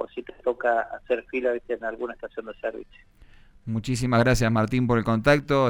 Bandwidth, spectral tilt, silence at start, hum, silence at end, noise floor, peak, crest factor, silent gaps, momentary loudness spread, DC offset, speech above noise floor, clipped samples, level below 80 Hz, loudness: 16.5 kHz; -6.5 dB/octave; 0 s; none; 0 s; -50 dBFS; -6 dBFS; 18 dB; none; 13 LU; under 0.1%; 26 dB; under 0.1%; -44 dBFS; -25 LUFS